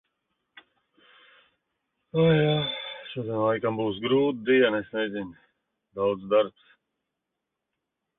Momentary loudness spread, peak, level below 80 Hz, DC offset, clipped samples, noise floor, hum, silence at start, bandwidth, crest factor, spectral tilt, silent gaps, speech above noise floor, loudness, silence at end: 13 LU; -10 dBFS; -64 dBFS; under 0.1%; under 0.1%; -84 dBFS; none; 2.15 s; 4.1 kHz; 18 dB; -10.5 dB/octave; none; 60 dB; -26 LUFS; 1.7 s